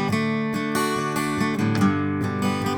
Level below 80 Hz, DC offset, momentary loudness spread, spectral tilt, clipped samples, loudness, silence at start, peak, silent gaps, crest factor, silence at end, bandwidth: -54 dBFS; under 0.1%; 3 LU; -5.5 dB/octave; under 0.1%; -23 LUFS; 0 s; -8 dBFS; none; 14 dB; 0 s; over 20 kHz